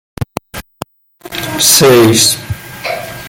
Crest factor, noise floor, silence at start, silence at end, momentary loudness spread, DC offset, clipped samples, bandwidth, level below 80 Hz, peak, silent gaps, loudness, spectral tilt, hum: 12 dB; -35 dBFS; 0.2 s; 0 s; 24 LU; under 0.1%; 0.1%; over 20 kHz; -40 dBFS; 0 dBFS; none; -8 LUFS; -3 dB/octave; none